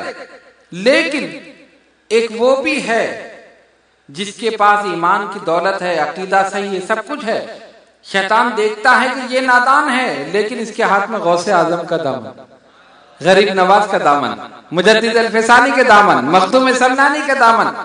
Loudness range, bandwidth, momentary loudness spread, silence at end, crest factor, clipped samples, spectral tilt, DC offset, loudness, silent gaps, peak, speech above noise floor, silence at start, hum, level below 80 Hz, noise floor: 6 LU; 10.5 kHz; 12 LU; 0 s; 14 dB; under 0.1%; -4 dB/octave; under 0.1%; -13 LUFS; none; 0 dBFS; 39 dB; 0 s; none; -60 dBFS; -53 dBFS